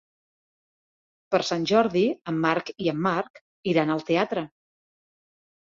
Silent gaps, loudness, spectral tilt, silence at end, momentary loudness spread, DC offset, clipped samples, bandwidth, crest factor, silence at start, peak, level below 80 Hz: 3.30-3.34 s, 3.41-3.63 s; -25 LUFS; -6 dB/octave; 1.3 s; 9 LU; under 0.1%; under 0.1%; 7.6 kHz; 20 dB; 1.3 s; -6 dBFS; -66 dBFS